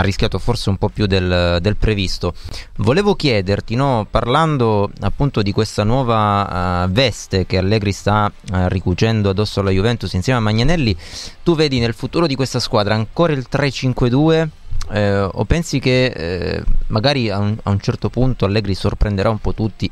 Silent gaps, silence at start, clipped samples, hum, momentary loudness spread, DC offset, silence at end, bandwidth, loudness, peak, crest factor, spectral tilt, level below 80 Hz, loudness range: none; 0 s; under 0.1%; none; 6 LU; under 0.1%; 0 s; 12.5 kHz; -17 LUFS; 0 dBFS; 16 dB; -6 dB/octave; -26 dBFS; 1 LU